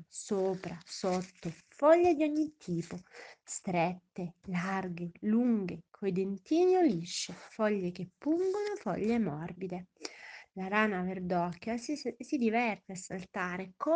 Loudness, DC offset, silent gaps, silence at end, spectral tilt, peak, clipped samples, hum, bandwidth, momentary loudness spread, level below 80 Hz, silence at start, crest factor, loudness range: -33 LUFS; under 0.1%; none; 0 s; -5.5 dB/octave; -12 dBFS; under 0.1%; none; 9.8 kHz; 15 LU; -70 dBFS; 0 s; 20 dB; 3 LU